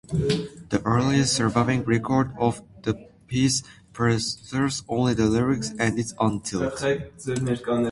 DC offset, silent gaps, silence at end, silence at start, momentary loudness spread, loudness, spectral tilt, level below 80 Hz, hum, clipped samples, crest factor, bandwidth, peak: under 0.1%; none; 0 s; 0.1 s; 8 LU; -24 LUFS; -5 dB/octave; -48 dBFS; none; under 0.1%; 18 dB; 11.5 kHz; -6 dBFS